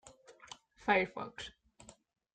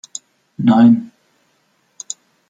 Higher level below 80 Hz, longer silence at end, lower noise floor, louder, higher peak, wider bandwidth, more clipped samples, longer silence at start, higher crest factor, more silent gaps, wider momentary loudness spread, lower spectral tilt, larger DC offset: about the same, -68 dBFS vs -64 dBFS; second, 0.45 s vs 1.45 s; about the same, -61 dBFS vs -62 dBFS; second, -34 LUFS vs -13 LUFS; second, -14 dBFS vs -2 dBFS; about the same, 9.4 kHz vs 8.8 kHz; neither; second, 0.05 s vs 0.6 s; first, 26 dB vs 16 dB; neither; about the same, 22 LU vs 22 LU; second, -4 dB/octave vs -6 dB/octave; neither